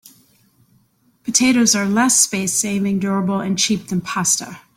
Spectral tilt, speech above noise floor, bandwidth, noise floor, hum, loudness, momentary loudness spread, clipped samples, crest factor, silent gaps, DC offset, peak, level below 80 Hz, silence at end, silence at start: -3 dB/octave; 41 dB; 16.5 kHz; -59 dBFS; none; -17 LUFS; 7 LU; under 0.1%; 18 dB; none; under 0.1%; -2 dBFS; -58 dBFS; 0.2 s; 1.25 s